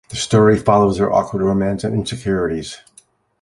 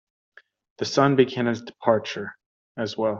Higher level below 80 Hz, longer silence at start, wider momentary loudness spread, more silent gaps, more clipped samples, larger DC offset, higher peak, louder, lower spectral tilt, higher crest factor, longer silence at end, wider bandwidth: first, -42 dBFS vs -66 dBFS; second, 0.1 s vs 0.8 s; second, 11 LU vs 14 LU; second, none vs 2.46-2.75 s; neither; neither; about the same, -2 dBFS vs -4 dBFS; first, -17 LUFS vs -24 LUFS; about the same, -6 dB/octave vs -5.5 dB/octave; about the same, 16 dB vs 20 dB; first, 0.65 s vs 0 s; first, 11.5 kHz vs 7.6 kHz